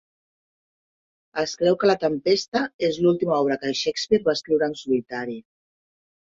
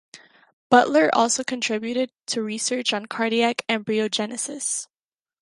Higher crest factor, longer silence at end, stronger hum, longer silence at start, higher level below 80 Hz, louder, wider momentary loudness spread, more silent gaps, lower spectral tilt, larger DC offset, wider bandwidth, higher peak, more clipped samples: about the same, 18 dB vs 22 dB; first, 1 s vs 0.55 s; neither; first, 1.35 s vs 0.15 s; first, -62 dBFS vs -70 dBFS; about the same, -23 LUFS vs -22 LUFS; about the same, 10 LU vs 9 LU; second, 2.48-2.52 s, 2.74-2.79 s vs 0.53-0.70 s; first, -5 dB/octave vs -2.5 dB/octave; neither; second, 7.8 kHz vs 11.5 kHz; second, -6 dBFS vs -2 dBFS; neither